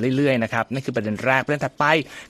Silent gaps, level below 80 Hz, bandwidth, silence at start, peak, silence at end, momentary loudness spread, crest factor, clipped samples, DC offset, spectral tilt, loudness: none; -58 dBFS; 14 kHz; 0 s; -2 dBFS; 0.05 s; 6 LU; 20 dB; under 0.1%; under 0.1%; -6 dB/octave; -21 LUFS